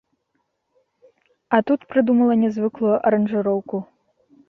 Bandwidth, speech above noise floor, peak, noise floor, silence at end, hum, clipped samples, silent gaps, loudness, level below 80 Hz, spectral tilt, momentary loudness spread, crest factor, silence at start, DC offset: 6 kHz; 53 dB; -2 dBFS; -72 dBFS; 0.65 s; none; under 0.1%; none; -20 LUFS; -64 dBFS; -9 dB/octave; 7 LU; 20 dB; 1.5 s; under 0.1%